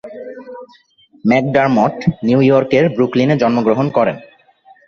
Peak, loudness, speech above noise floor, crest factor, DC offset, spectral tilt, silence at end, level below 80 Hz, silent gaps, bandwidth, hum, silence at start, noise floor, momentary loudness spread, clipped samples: -2 dBFS; -14 LUFS; 37 dB; 14 dB; under 0.1%; -8 dB/octave; 0.65 s; -52 dBFS; none; 7 kHz; none; 0.05 s; -50 dBFS; 20 LU; under 0.1%